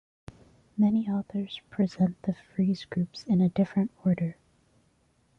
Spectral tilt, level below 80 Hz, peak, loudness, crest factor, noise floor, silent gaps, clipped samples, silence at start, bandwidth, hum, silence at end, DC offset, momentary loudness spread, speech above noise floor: -8.5 dB/octave; -62 dBFS; -16 dBFS; -28 LUFS; 14 dB; -67 dBFS; none; under 0.1%; 0.75 s; 7 kHz; none; 1.05 s; under 0.1%; 9 LU; 40 dB